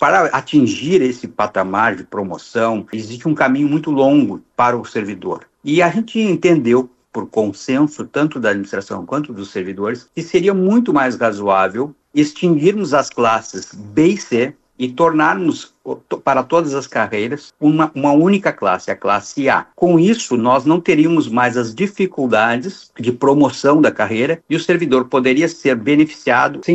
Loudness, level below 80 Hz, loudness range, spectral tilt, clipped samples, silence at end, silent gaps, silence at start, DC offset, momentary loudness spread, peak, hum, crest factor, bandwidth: -16 LUFS; -58 dBFS; 3 LU; -6 dB/octave; under 0.1%; 0 s; none; 0 s; under 0.1%; 11 LU; -2 dBFS; none; 14 dB; 8.2 kHz